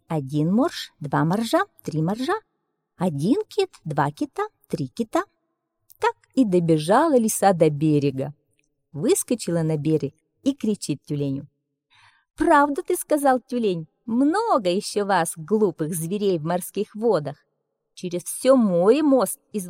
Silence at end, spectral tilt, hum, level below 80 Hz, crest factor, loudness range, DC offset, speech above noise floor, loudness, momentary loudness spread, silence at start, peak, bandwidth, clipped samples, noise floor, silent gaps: 0 s; -5.5 dB/octave; none; -60 dBFS; 18 dB; 5 LU; under 0.1%; 54 dB; -22 LUFS; 11 LU; 0.1 s; -6 dBFS; 16.5 kHz; under 0.1%; -76 dBFS; none